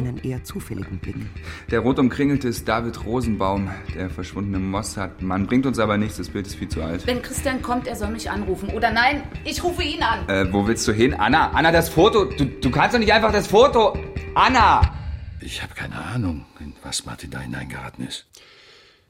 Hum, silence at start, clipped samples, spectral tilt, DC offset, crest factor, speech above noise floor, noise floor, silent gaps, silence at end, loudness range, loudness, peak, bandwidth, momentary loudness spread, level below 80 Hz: none; 0 s; under 0.1%; -5 dB/octave; under 0.1%; 18 dB; 30 dB; -51 dBFS; none; 0.9 s; 8 LU; -21 LUFS; -2 dBFS; 16.5 kHz; 15 LU; -36 dBFS